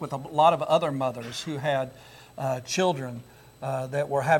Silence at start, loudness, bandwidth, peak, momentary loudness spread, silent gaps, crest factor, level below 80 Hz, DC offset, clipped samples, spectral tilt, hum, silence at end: 0 s; -27 LUFS; 17 kHz; -8 dBFS; 16 LU; none; 20 dB; -64 dBFS; under 0.1%; under 0.1%; -5 dB/octave; none; 0 s